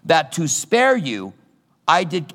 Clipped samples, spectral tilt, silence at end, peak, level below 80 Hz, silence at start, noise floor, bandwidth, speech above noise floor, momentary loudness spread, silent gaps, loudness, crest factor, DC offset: under 0.1%; -3.5 dB/octave; 0 s; -2 dBFS; -74 dBFS; 0.05 s; -49 dBFS; 16.5 kHz; 31 dB; 12 LU; none; -18 LUFS; 18 dB; under 0.1%